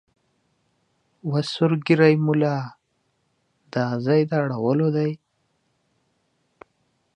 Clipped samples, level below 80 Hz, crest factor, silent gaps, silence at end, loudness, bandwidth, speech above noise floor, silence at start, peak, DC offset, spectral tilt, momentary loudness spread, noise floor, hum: under 0.1%; -70 dBFS; 22 dB; none; 2 s; -22 LUFS; 9.6 kHz; 50 dB; 1.25 s; -2 dBFS; under 0.1%; -8 dB/octave; 13 LU; -71 dBFS; none